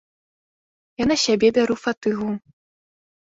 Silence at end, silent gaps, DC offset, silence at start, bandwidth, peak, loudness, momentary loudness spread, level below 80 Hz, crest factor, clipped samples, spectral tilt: 0.9 s; 1.97-2.01 s; under 0.1%; 1 s; 8 kHz; -6 dBFS; -21 LUFS; 13 LU; -54 dBFS; 18 dB; under 0.1%; -4 dB/octave